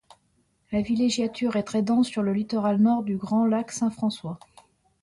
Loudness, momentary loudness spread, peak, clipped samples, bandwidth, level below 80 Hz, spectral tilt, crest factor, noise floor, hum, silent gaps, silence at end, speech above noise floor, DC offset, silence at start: -25 LUFS; 8 LU; -12 dBFS; under 0.1%; 11.5 kHz; -60 dBFS; -6 dB/octave; 14 dB; -68 dBFS; none; none; 0.65 s; 44 dB; under 0.1%; 0.7 s